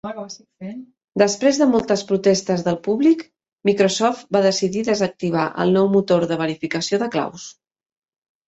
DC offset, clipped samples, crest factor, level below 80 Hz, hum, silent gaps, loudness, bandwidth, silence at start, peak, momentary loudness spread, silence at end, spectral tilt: under 0.1%; under 0.1%; 18 dB; -60 dBFS; none; 1.04-1.08 s, 3.53-3.57 s; -19 LUFS; 8.2 kHz; 0.05 s; -2 dBFS; 17 LU; 0.95 s; -5 dB/octave